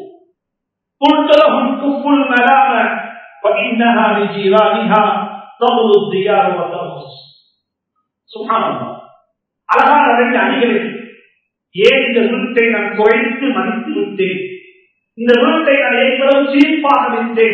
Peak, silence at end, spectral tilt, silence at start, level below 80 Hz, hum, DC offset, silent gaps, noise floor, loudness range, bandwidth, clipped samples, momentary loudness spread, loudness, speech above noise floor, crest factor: 0 dBFS; 0 s; -6.5 dB/octave; 0 s; -62 dBFS; none; under 0.1%; none; -77 dBFS; 4 LU; 8 kHz; 0.1%; 12 LU; -12 LUFS; 65 dB; 14 dB